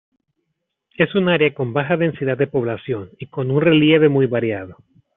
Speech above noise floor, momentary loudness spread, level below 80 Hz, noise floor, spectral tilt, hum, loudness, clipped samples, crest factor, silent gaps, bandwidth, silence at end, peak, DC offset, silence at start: 58 dB; 14 LU; -58 dBFS; -75 dBFS; -5 dB/octave; none; -18 LUFS; under 0.1%; 16 dB; none; 4 kHz; 0.45 s; -2 dBFS; under 0.1%; 1 s